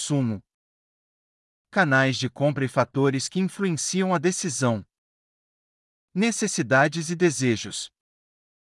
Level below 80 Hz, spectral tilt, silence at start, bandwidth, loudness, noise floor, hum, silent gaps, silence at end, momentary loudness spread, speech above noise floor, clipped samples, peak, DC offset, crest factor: -72 dBFS; -4.5 dB/octave; 0 s; 12 kHz; -24 LUFS; under -90 dBFS; none; 0.54-1.65 s, 4.98-6.08 s; 0.8 s; 10 LU; over 67 dB; under 0.1%; -6 dBFS; under 0.1%; 18 dB